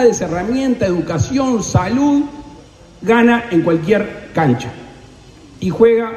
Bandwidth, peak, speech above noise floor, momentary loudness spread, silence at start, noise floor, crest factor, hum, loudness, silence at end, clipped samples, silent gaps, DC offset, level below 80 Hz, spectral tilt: 12 kHz; -2 dBFS; 26 dB; 12 LU; 0 s; -40 dBFS; 14 dB; none; -16 LUFS; 0 s; under 0.1%; none; under 0.1%; -42 dBFS; -6 dB/octave